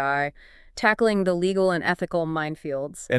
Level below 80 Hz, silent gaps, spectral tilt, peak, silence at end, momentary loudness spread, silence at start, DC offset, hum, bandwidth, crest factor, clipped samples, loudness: -54 dBFS; none; -5.5 dB/octave; -6 dBFS; 0 s; 10 LU; 0 s; under 0.1%; none; 12 kHz; 18 dB; under 0.1%; -24 LUFS